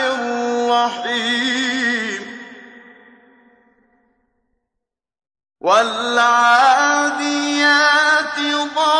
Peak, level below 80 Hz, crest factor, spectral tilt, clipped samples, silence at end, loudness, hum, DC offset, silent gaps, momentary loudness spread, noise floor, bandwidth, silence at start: -2 dBFS; -72 dBFS; 16 dB; -1 dB/octave; under 0.1%; 0 s; -15 LUFS; none; under 0.1%; none; 11 LU; -80 dBFS; 10.5 kHz; 0 s